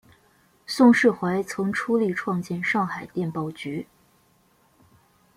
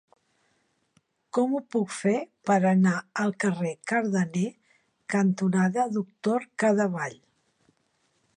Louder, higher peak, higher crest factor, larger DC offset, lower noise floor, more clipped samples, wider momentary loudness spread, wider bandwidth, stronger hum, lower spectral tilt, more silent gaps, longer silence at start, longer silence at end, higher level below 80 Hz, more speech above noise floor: first, -23 LUFS vs -26 LUFS; first, -4 dBFS vs -12 dBFS; about the same, 20 dB vs 16 dB; neither; second, -62 dBFS vs -71 dBFS; neither; first, 16 LU vs 8 LU; first, 14.5 kHz vs 10 kHz; neither; about the same, -6 dB/octave vs -6.5 dB/octave; neither; second, 0.7 s vs 1.35 s; first, 1.55 s vs 1.25 s; first, -66 dBFS vs -74 dBFS; second, 39 dB vs 46 dB